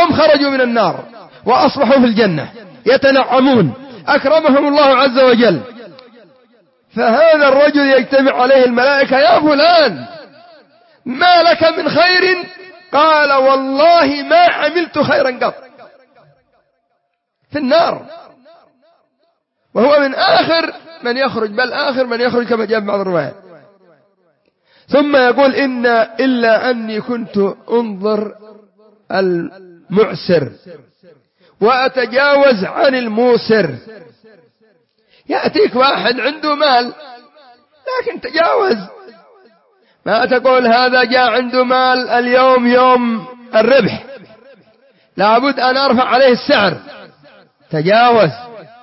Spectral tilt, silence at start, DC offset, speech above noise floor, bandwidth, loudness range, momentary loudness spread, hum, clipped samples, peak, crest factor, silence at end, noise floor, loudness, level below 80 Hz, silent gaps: -8.5 dB/octave; 0 s; under 0.1%; 56 dB; 5.8 kHz; 7 LU; 11 LU; none; under 0.1%; 0 dBFS; 14 dB; 0.2 s; -68 dBFS; -12 LUFS; -58 dBFS; none